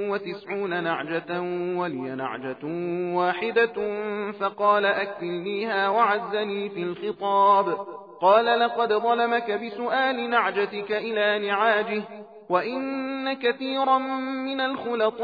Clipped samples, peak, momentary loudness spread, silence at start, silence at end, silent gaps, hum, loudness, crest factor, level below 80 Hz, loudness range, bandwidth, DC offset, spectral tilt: under 0.1%; -6 dBFS; 10 LU; 0 s; 0 s; none; none; -25 LUFS; 18 dB; -76 dBFS; 4 LU; 5 kHz; under 0.1%; -7.5 dB/octave